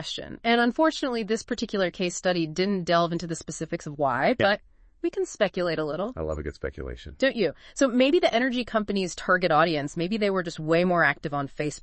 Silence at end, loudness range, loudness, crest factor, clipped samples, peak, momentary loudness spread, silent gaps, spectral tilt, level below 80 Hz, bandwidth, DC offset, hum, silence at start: 0 s; 4 LU; -26 LUFS; 18 dB; under 0.1%; -8 dBFS; 11 LU; none; -5 dB/octave; -50 dBFS; 8.8 kHz; under 0.1%; none; 0 s